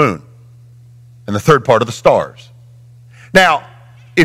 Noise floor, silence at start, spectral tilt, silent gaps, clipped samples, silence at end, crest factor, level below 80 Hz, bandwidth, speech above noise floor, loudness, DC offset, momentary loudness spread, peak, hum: -41 dBFS; 0 s; -5 dB/octave; none; under 0.1%; 0 s; 16 dB; -46 dBFS; 16.5 kHz; 28 dB; -13 LUFS; under 0.1%; 16 LU; 0 dBFS; 60 Hz at -45 dBFS